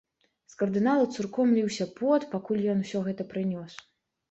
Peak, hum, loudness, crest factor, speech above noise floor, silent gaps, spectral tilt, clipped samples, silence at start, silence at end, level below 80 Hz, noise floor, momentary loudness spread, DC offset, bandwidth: -14 dBFS; none; -28 LUFS; 16 dB; 34 dB; none; -6.5 dB/octave; under 0.1%; 0.6 s; 0.55 s; -70 dBFS; -61 dBFS; 8 LU; under 0.1%; 8.2 kHz